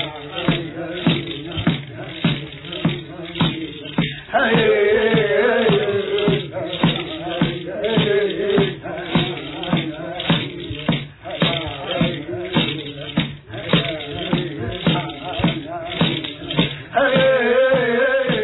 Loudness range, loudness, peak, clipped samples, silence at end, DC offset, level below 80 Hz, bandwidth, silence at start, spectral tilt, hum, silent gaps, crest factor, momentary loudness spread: 5 LU; -20 LUFS; -2 dBFS; under 0.1%; 0 s; under 0.1%; -46 dBFS; 4.1 kHz; 0 s; -9 dB/octave; none; none; 18 dB; 11 LU